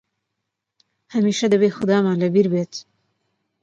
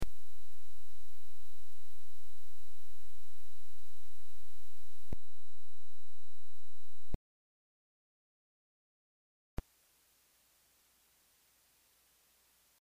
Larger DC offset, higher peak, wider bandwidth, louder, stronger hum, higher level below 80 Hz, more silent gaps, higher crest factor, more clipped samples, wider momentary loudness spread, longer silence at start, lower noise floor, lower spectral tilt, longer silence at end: neither; first, -6 dBFS vs -22 dBFS; second, 7.8 kHz vs 15.5 kHz; first, -19 LUFS vs -59 LUFS; neither; second, -66 dBFS vs -56 dBFS; second, none vs 7.15-9.57 s; first, 16 dB vs 6 dB; neither; second, 10 LU vs 19 LU; first, 1.1 s vs 0 s; first, -80 dBFS vs -71 dBFS; about the same, -6 dB/octave vs -6 dB/octave; first, 0.8 s vs 0 s